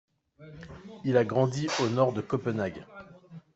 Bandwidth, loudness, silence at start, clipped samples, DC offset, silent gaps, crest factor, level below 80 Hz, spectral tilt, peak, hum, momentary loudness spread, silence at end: 8.2 kHz; -28 LUFS; 0.4 s; under 0.1%; under 0.1%; none; 20 dB; -64 dBFS; -6 dB/octave; -10 dBFS; none; 22 LU; 0.15 s